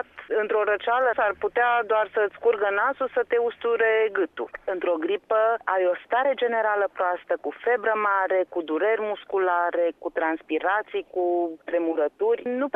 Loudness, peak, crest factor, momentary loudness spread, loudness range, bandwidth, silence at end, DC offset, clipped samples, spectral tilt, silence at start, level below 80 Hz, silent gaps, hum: -24 LUFS; -8 dBFS; 16 dB; 5 LU; 2 LU; 3.9 kHz; 0.05 s; under 0.1%; under 0.1%; -6 dB/octave; 0.15 s; -68 dBFS; none; none